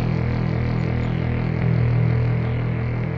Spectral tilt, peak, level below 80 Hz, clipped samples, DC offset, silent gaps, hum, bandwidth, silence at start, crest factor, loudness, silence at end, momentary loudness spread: -10 dB/octave; -10 dBFS; -34 dBFS; under 0.1%; under 0.1%; none; none; 5.4 kHz; 0 s; 10 dB; -22 LUFS; 0 s; 4 LU